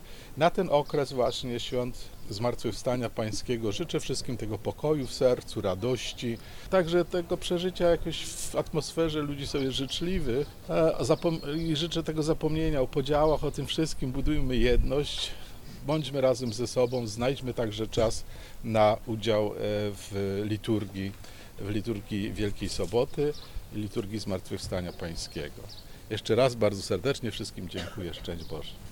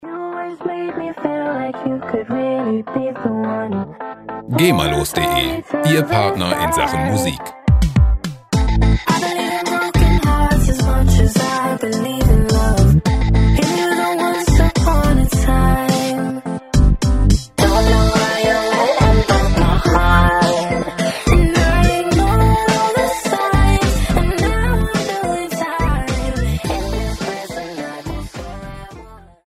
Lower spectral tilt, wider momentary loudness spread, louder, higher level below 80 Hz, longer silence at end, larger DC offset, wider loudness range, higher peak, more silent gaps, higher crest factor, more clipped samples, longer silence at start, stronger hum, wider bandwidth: about the same, -5.5 dB/octave vs -5.5 dB/octave; about the same, 12 LU vs 10 LU; second, -30 LUFS vs -16 LUFS; second, -40 dBFS vs -20 dBFS; second, 0 s vs 0.3 s; neither; second, 4 LU vs 7 LU; second, -10 dBFS vs 0 dBFS; neither; first, 20 dB vs 14 dB; neither; about the same, 0 s vs 0 s; neither; first, 19 kHz vs 15.5 kHz